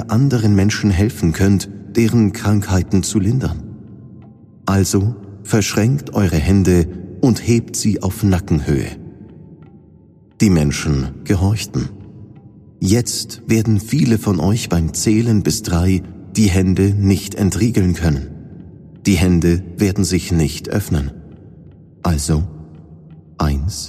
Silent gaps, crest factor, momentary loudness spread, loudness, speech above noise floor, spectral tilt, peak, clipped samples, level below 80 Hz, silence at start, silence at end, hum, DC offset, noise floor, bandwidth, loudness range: none; 16 dB; 9 LU; -17 LUFS; 31 dB; -6 dB/octave; -2 dBFS; under 0.1%; -32 dBFS; 0 s; 0 s; none; under 0.1%; -46 dBFS; 15.5 kHz; 4 LU